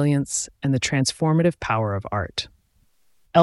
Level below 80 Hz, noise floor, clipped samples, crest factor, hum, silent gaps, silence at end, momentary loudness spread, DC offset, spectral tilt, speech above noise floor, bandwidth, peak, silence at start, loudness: -50 dBFS; -62 dBFS; under 0.1%; 18 dB; none; none; 0 s; 8 LU; under 0.1%; -5 dB/octave; 39 dB; 12 kHz; -4 dBFS; 0 s; -23 LUFS